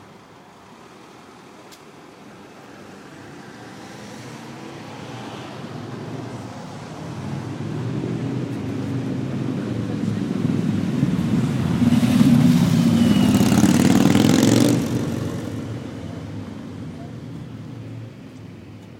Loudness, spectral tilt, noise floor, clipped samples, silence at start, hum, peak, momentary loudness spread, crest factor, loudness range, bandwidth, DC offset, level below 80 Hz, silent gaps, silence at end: -20 LUFS; -6 dB/octave; -45 dBFS; under 0.1%; 0 s; none; 0 dBFS; 24 LU; 22 dB; 22 LU; 17 kHz; under 0.1%; -50 dBFS; none; 0 s